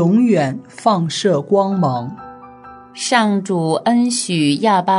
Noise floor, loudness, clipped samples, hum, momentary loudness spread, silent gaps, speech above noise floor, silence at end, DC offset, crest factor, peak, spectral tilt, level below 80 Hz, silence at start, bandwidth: -39 dBFS; -16 LUFS; under 0.1%; none; 10 LU; none; 23 dB; 0 s; under 0.1%; 16 dB; 0 dBFS; -5 dB/octave; -62 dBFS; 0 s; 11 kHz